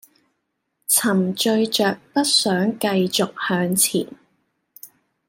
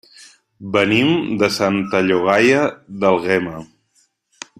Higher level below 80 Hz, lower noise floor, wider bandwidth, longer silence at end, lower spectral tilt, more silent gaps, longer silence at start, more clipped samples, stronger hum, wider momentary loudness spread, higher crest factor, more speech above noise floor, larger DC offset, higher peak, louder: second, -68 dBFS vs -56 dBFS; first, -75 dBFS vs -62 dBFS; about the same, 16.5 kHz vs 15 kHz; second, 0.4 s vs 0.95 s; second, -3 dB/octave vs -5 dB/octave; neither; first, 0.9 s vs 0.6 s; neither; neither; second, 5 LU vs 13 LU; about the same, 18 dB vs 18 dB; first, 55 dB vs 45 dB; neither; second, -4 dBFS vs 0 dBFS; about the same, -19 LUFS vs -17 LUFS